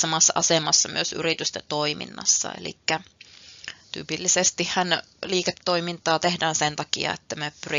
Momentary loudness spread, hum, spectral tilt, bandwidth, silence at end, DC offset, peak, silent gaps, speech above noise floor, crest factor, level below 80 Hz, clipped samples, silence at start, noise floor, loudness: 13 LU; none; -1.5 dB/octave; 7.6 kHz; 0 s; under 0.1%; -4 dBFS; none; 22 dB; 20 dB; -66 dBFS; under 0.1%; 0 s; -47 dBFS; -23 LUFS